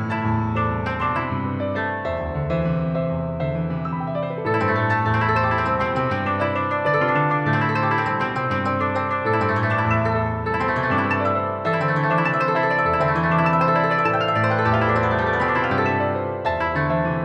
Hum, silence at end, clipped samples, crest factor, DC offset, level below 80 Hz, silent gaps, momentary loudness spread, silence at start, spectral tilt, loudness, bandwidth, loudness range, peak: none; 0 s; under 0.1%; 14 dB; under 0.1%; -42 dBFS; none; 6 LU; 0 s; -8 dB/octave; -21 LUFS; 8.6 kHz; 5 LU; -6 dBFS